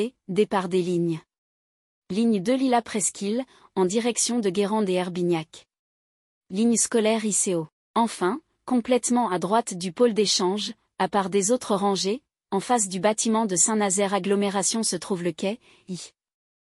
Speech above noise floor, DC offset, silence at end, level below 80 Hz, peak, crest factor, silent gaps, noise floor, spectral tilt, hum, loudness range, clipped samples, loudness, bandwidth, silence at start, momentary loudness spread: over 66 dB; under 0.1%; 0.65 s; -68 dBFS; -6 dBFS; 18 dB; 1.38-2.02 s, 5.79-6.41 s, 7.72-7.94 s; under -90 dBFS; -3.5 dB/octave; none; 3 LU; under 0.1%; -24 LUFS; 13.5 kHz; 0 s; 10 LU